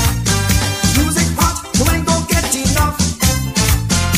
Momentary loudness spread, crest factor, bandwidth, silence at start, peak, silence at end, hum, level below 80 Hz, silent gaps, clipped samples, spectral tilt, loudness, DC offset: 2 LU; 14 dB; 16 kHz; 0 s; 0 dBFS; 0 s; none; -22 dBFS; none; under 0.1%; -3.5 dB/octave; -15 LUFS; under 0.1%